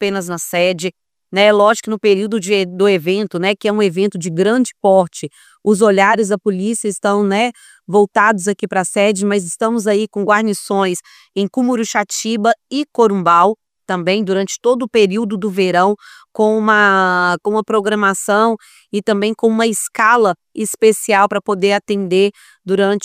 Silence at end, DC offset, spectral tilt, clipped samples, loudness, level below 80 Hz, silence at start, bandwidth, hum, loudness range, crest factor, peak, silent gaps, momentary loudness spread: 0 s; under 0.1%; -4.5 dB/octave; under 0.1%; -15 LUFS; -66 dBFS; 0 s; 16 kHz; none; 2 LU; 14 dB; 0 dBFS; none; 9 LU